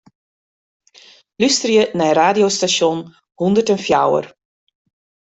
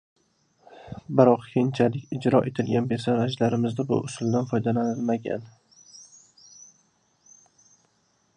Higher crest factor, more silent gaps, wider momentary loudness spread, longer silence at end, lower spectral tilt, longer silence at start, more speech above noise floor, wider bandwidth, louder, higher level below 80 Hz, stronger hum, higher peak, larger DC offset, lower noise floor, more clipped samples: second, 16 dB vs 24 dB; neither; second, 8 LU vs 14 LU; second, 0.95 s vs 2.35 s; second, -3.5 dB/octave vs -7 dB/octave; first, 1.4 s vs 0.8 s; second, 32 dB vs 44 dB; second, 8.4 kHz vs 10 kHz; first, -16 LUFS vs -24 LUFS; first, -58 dBFS vs -64 dBFS; neither; about the same, -2 dBFS vs -2 dBFS; neither; second, -48 dBFS vs -68 dBFS; neither